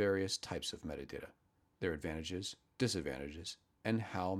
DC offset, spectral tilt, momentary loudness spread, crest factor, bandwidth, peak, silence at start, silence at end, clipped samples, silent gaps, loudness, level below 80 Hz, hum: under 0.1%; -4.5 dB/octave; 11 LU; 20 dB; 15 kHz; -20 dBFS; 0 s; 0 s; under 0.1%; none; -41 LUFS; -60 dBFS; none